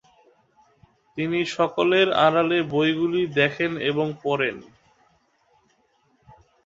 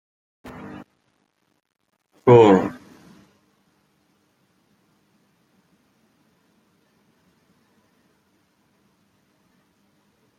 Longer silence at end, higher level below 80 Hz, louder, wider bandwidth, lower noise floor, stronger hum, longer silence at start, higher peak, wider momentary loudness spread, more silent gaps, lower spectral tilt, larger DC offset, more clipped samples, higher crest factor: second, 2.05 s vs 7.65 s; about the same, -64 dBFS vs -64 dBFS; second, -22 LUFS vs -15 LUFS; about the same, 7.8 kHz vs 7.6 kHz; second, -65 dBFS vs -69 dBFS; neither; second, 1.15 s vs 2.25 s; about the same, -4 dBFS vs -2 dBFS; second, 8 LU vs 31 LU; neither; second, -6 dB/octave vs -8 dB/octave; neither; neither; about the same, 20 dB vs 24 dB